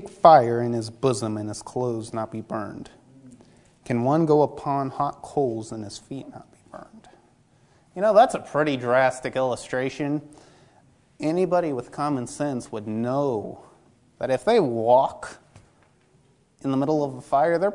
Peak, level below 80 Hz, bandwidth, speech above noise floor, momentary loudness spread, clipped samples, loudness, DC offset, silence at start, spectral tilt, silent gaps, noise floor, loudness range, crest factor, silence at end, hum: 0 dBFS; -62 dBFS; 11 kHz; 38 dB; 17 LU; under 0.1%; -23 LUFS; under 0.1%; 0 s; -6.5 dB/octave; none; -60 dBFS; 6 LU; 24 dB; 0 s; none